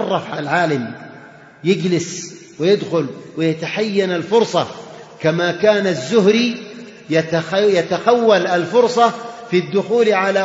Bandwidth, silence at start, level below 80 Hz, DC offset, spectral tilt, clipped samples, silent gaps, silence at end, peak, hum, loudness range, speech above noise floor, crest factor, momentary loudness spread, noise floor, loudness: 8 kHz; 0 s; -64 dBFS; under 0.1%; -5 dB/octave; under 0.1%; none; 0 s; 0 dBFS; none; 4 LU; 24 dB; 18 dB; 15 LU; -41 dBFS; -17 LUFS